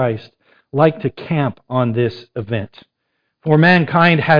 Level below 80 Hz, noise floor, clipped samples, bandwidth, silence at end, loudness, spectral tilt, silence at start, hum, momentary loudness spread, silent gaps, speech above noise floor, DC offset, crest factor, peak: -52 dBFS; -71 dBFS; under 0.1%; 5.2 kHz; 0 s; -16 LUFS; -9 dB/octave; 0 s; none; 16 LU; none; 56 dB; under 0.1%; 16 dB; 0 dBFS